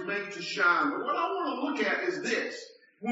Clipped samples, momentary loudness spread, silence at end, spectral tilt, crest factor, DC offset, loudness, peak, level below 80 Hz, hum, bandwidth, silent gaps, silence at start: under 0.1%; 11 LU; 0 s; -1.5 dB/octave; 16 dB; under 0.1%; -29 LUFS; -14 dBFS; -88 dBFS; none; 8 kHz; none; 0 s